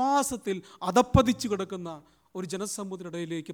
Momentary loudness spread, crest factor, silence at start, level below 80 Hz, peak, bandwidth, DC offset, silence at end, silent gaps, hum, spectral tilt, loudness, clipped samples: 17 LU; 22 dB; 0 s; -46 dBFS; -6 dBFS; 19.5 kHz; under 0.1%; 0 s; none; none; -5 dB/octave; -28 LUFS; under 0.1%